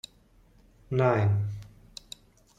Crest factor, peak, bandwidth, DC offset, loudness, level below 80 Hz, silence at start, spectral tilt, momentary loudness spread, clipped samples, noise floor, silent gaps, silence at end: 22 dB; -10 dBFS; 10 kHz; under 0.1%; -27 LUFS; -56 dBFS; 0.9 s; -7.5 dB/octave; 23 LU; under 0.1%; -60 dBFS; none; 0.9 s